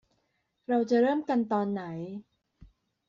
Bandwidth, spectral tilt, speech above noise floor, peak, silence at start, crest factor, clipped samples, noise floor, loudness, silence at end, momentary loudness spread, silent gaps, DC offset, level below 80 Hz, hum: 7.4 kHz; -6 dB/octave; 49 dB; -14 dBFS; 0.7 s; 16 dB; under 0.1%; -76 dBFS; -28 LUFS; 0.4 s; 17 LU; none; under 0.1%; -68 dBFS; none